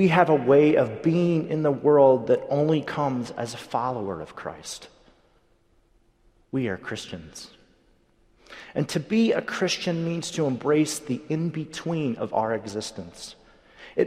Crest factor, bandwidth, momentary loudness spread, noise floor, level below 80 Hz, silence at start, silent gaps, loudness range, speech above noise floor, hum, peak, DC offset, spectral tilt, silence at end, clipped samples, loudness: 22 dB; 15 kHz; 19 LU; -63 dBFS; -62 dBFS; 0 s; none; 14 LU; 39 dB; none; -4 dBFS; under 0.1%; -6 dB/octave; 0 s; under 0.1%; -24 LUFS